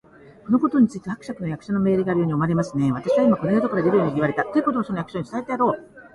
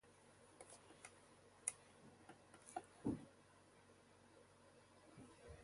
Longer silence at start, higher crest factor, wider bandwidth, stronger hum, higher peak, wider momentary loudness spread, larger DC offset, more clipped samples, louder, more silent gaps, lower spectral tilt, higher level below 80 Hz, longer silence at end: first, 0.45 s vs 0.05 s; second, 14 dB vs 34 dB; about the same, 11.5 kHz vs 11.5 kHz; neither; first, -6 dBFS vs -24 dBFS; second, 11 LU vs 20 LU; neither; neither; first, -22 LUFS vs -54 LUFS; neither; first, -8.5 dB/octave vs -4 dB/octave; first, -56 dBFS vs -74 dBFS; about the same, 0.05 s vs 0 s